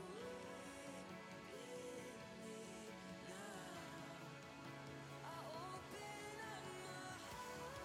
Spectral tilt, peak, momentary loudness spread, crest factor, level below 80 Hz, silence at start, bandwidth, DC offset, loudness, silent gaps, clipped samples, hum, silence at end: -4 dB/octave; -40 dBFS; 3 LU; 14 dB; -76 dBFS; 0 s; 17 kHz; under 0.1%; -53 LUFS; none; under 0.1%; none; 0 s